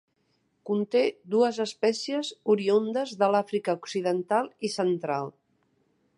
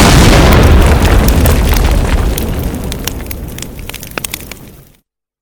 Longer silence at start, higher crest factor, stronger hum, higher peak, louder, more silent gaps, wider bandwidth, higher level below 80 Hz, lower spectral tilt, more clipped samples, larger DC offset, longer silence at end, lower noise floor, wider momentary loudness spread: first, 0.65 s vs 0 s; first, 18 dB vs 10 dB; neither; second, -10 dBFS vs 0 dBFS; second, -27 LUFS vs -10 LUFS; neither; second, 11 kHz vs over 20 kHz; second, -80 dBFS vs -12 dBFS; about the same, -5 dB/octave vs -5 dB/octave; second, under 0.1% vs 0.7%; neither; first, 0.9 s vs 0.7 s; first, -72 dBFS vs -54 dBFS; second, 7 LU vs 18 LU